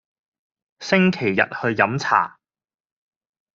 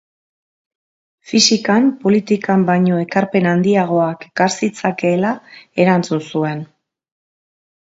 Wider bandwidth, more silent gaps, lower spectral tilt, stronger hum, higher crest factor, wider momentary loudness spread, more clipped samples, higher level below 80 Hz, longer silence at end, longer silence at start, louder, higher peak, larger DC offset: about the same, 7.4 kHz vs 8 kHz; neither; about the same, -4 dB/octave vs -5 dB/octave; neither; about the same, 22 dB vs 18 dB; about the same, 6 LU vs 8 LU; neither; about the same, -64 dBFS vs -62 dBFS; about the same, 1.25 s vs 1.25 s; second, 0.8 s vs 1.3 s; second, -20 LUFS vs -16 LUFS; about the same, -2 dBFS vs 0 dBFS; neither